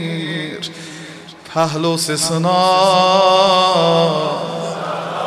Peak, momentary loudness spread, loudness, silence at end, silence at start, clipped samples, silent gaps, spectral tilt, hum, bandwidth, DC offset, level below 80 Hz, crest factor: 0 dBFS; 17 LU; -15 LUFS; 0 s; 0 s; under 0.1%; none; -4 dB/octave; none; 15 kHz; under 0.1%; -58 dBFS; 14 dB